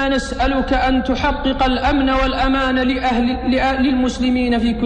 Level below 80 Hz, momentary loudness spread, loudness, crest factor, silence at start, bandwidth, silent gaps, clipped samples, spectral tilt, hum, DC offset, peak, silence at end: -26 dBFS; 3 LU; -17 LUFS; 12 dB; 0 s; 9.6 kHz; none; under 0.1%; -5.5 dB/octave; none; under 0.1%; -6 dBFS; 0 s